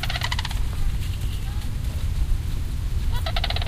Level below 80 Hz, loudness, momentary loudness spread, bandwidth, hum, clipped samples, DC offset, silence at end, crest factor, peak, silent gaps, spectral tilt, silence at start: -26 dBFS; -28 LUFS; 4 LU; 15.5 kHz; none; under 0.1%; under 0.1%; 0 s; 16 dB; -8 dBFS; none; -4.5 dB/octave; 0 s